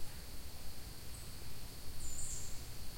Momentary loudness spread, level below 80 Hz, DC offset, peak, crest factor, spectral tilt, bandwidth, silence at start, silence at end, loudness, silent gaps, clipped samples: 7 LU; -50 dBFS; 0.5%; -26 dBFS; 14 dB; -2.5 dB/octave; 16.5 kHz; 0 s; 0 s; -48 LUFS; none; under 0.1%